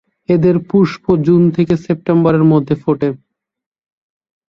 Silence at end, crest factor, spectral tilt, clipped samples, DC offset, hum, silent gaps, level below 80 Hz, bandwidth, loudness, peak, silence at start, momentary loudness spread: 1.3 s; 14 dB; -9.5 dB/octave; under 0.1%; under 0.1%; none; none; -48 dBFS; 6.8 kHz; -13 LUFS; 0 dBFS; 0.3 s; 6 LU